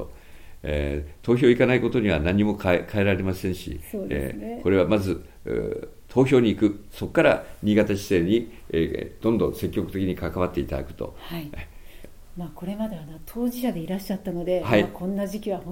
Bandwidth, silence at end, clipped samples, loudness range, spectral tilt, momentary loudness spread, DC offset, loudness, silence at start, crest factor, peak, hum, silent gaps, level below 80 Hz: 17 kHz; 0 s; under 0.1%; 9 LU; -7 dB/octave; 15 LU; under 0.1%; -24 LUFS; 0 s; 20 dB; -4 dBFS; none; none; -42 dBFS